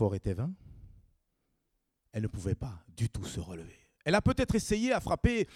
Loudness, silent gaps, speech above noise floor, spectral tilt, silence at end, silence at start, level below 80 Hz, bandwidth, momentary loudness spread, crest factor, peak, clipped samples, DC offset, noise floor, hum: -32 LUFS; none; 49 dB; -6 dB/octave; 0 s; 0 s; -46 dBFS; 15 kHz; 15 LU; 20 dB; -12 dBFS; under 0.1%; under 0.1%; -81 dBFS; none